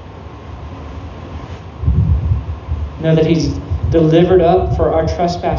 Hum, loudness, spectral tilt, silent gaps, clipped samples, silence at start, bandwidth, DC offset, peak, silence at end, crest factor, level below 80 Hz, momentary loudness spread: none; -15 LUFS; -8 dB/octave; none; under 0.1%; 0 s; 7.2 kHz; under 0.1%; 0 dBFS; 0 s; 14 dB; -24 dBFS; 20 LU